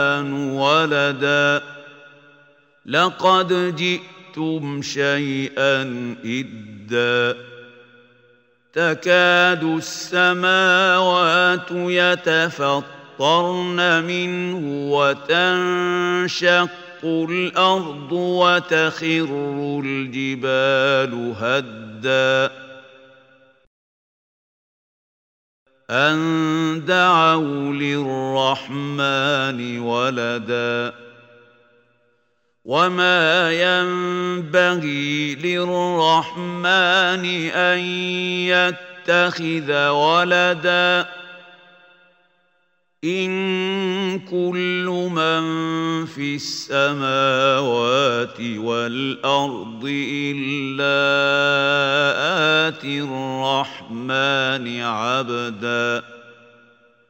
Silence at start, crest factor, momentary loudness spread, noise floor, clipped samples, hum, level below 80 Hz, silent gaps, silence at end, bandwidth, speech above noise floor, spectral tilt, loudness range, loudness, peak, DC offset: 0 s; 18 dB; 10 LU; -68 dBFS; under 0.1%; none; -72 dBFS; 23.67-25.66 s; 0.8 s; 16 kHz; 48 dB; -4.5 dB/octave; 6 LU; -19 LUFS; -2 dBFS; under 0.1%